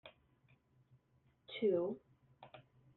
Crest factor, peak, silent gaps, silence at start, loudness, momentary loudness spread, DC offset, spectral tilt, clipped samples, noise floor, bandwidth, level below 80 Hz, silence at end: 20 dB; -24 dBFS; none; 0.05 s; -39 LUFS; 24 LU; under 0.1%; -5 dB/octave; under 0.1%; -75 dBFS; 4.3 kHz; -84 dBFS; 0.35 s